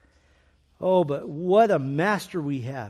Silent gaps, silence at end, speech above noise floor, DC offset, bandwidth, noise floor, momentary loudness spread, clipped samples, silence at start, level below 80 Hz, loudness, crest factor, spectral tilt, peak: none; 0 s; 38 dB; under 0.1%; 13.5 kHz; -61 dBFS; 10 LU; under 0.1%; 0.8 s; -64 dBFS; -24 LUFS; 16 dB; -7 dB/octave; -8 dBFS